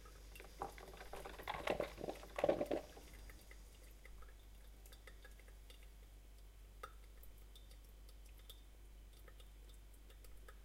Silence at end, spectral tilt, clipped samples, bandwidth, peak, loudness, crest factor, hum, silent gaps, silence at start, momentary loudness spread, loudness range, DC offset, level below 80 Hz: 0 s; -5 dB/octave; under 0.1%; 16 kHz; -22 dBFS; -47 LUFS; 28 dB; none; none; 0 s; 20 LU; 16 LU; under 0.1%; -58 dBFS